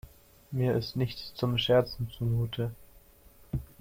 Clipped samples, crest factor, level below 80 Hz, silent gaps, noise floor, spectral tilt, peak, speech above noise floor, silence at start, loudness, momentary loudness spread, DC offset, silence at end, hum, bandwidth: under 0.1%; 18 dB; -50 dBFS; none; -57 dBFS; -7 dB/octave; -12 dBFS; 27 dB; 0.05 s; -31 LUFS; 13 LU; under 0.1%; 0.15 s; none; 16.5 kHz